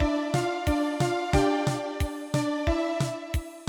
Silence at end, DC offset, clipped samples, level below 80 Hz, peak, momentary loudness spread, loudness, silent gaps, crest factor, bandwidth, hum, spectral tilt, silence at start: 0 s; under 0.1%; under 0.1%; -36 dBFS; -10 dBFS; 7 LU; -27 LUFS; none; 16 dB; 19.5 kHz; none; -6 dB/octave; 0 s